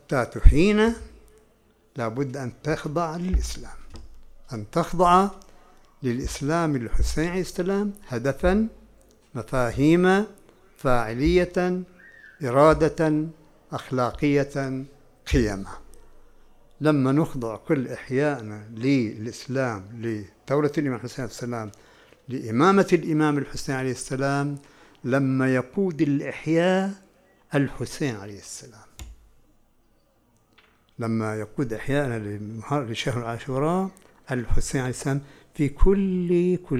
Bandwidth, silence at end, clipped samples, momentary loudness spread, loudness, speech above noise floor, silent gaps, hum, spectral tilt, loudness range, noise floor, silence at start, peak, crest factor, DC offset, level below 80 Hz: 14 kHz; 0 s; under 0.1%; 15 LU; -25 LUFS; 40 dB; none; none; -6.5 dB/octave; 7 LU; -63 dBFS; 0.1 s; 0 dBFS; 24 dB; under 0.1%; -32 dBFS